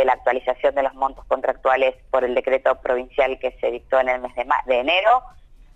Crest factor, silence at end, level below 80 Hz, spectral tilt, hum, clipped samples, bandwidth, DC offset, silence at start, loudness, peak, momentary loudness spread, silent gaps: 14 dB; 0.45 s; -48 dBFS; -4.5 dB/octave; none; under 0.1%; 7.8 kHz; under 0.1%; 0 s; -21 LUFS; -6 dBFS; 6 LU; none